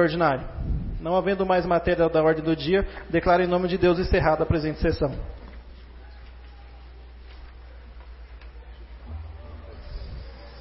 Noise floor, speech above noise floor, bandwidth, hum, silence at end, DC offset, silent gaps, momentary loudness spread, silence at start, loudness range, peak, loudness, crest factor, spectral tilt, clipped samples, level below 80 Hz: -44 dBFS; 21 dB; 5.8 kHz; none; 0 s; under 0.1%; none; 25 LU; 0 s; 23 LU; -8 dBFS; -23 LUFS; 18 dB; -10.5 dB/octave; under 0.1%; -36 dBFS